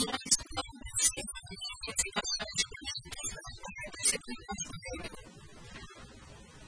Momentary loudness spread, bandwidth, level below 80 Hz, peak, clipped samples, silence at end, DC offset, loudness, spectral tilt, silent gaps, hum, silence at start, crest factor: 22 LU; 11 kHz; -54 dBFS; -12 dBFS; under 0.1%; 0 s; under 0.1%; -33 LUFS; -0.5 dB/octave; none; none; 0 s; 24 dB